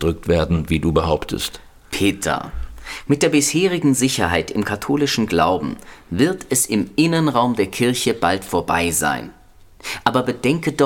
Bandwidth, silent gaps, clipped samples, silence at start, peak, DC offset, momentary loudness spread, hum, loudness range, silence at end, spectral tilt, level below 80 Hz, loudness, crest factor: 18.5 kHz; none; under 0.1%; 0 s; 0 dBFS; under 0.1%; 12 LU; none; 2 LU; 0 s; -4.5 dB/octave; -38 dBFS; -19 LUFS; 18 dB